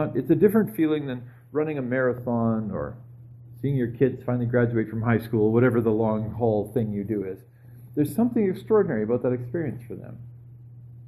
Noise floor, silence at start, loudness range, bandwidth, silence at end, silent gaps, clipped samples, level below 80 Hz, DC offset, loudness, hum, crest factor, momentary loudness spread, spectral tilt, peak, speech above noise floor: -45 dBFS; 0 s; 3 LU; 13 kHz; 0 s; none; under 0.1%; -54 dBFS; under 0.1%; -25 LUFS; none; 18 dB; 15 LU; -9 dB/octave; -6 dBFS; 21 dB